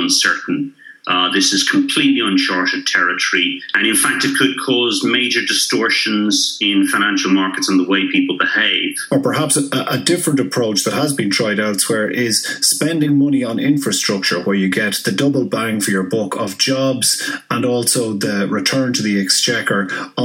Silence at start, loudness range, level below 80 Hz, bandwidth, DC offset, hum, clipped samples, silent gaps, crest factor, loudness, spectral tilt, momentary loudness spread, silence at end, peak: 0 s; 2 LU; -68 dBFS; 16.5 kHz; under 0.1%; none; under 0.1%; none; 16 dB; -15 LUFS; -3 dB/octave; 5 LU; 0 s; 0 dBFS